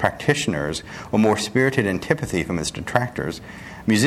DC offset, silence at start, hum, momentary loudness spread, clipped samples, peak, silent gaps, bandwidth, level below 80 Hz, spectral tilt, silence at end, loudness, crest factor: under 0.1%; 0 s; none; 10 LU; under 0.1%; 0 dBFS; none; 14.5 kHz; -46 dBFS; -5 dB/octave; 0 s; -22 LUFS; 22 dB